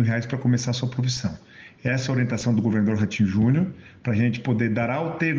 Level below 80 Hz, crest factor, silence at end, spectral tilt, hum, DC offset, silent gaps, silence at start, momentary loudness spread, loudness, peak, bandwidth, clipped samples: -54 dBFS; 14 dB; 0 s; -6.5 dB/octave; none; under 0.1%; none; 0 s; 8 LU; -24 LUFS; -10 dBFS; 7.6 kHz; under 0.1%